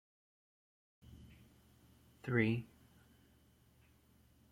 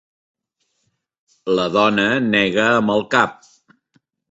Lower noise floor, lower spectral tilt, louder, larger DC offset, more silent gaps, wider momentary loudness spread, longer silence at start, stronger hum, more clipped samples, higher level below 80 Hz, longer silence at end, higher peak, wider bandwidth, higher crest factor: about the same, -69 dBFS vs -71 dBFS; first, -8 dB/octave vs -5 dB/octave; second, -37 LUFS vs -17 LUFS; neither; neither; first, 27 LU vs 6 LU; second, 1.1 s vs 1.45 s; neither; neither; second, -70 dBFS vs -58 dBFS; first, 1.85 s vs 1 s; second, -18 dBFS vs -2 dBFS; first, 15.5 kHz vs 8 kHz; first, 26 dB vs 18 dB